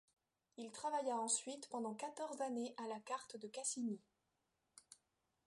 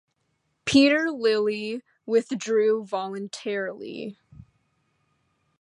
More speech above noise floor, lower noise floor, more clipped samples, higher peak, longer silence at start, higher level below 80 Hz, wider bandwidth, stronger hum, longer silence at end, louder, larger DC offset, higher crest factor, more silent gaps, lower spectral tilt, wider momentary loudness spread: second, 42 dB vs 50 dB; first, -87 dBFS vs -74 dBFS; neither; second, -26 dBFS vs -6 dBFS; about the same, 0.6 s vs 0.65 s; second, under -90 dBFS vs -64 dBFS; about the same, 11.5 kHz vs 11 kHz; neither; second, 0.55 s vs 1.5 s; second, -44 LUFS vs -24 LUFS; neither; about the same, 22 dB vs 20 dB; neither; second, -2.5 dB/octave vs -4 dB/octave; second, 14 LU vs 17 LU